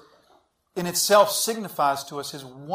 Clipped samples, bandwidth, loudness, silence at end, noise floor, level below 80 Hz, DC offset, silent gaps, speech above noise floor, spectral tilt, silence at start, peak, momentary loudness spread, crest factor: under 0.1%; 16 kHz; -22 LUFS; 0 s; -62 dBFS; -68 dBFS; under 0.1%; none; 39 dB; -2.5 dB/octave; 0.75 s; -4 dBFS; 18 LU; 20 dB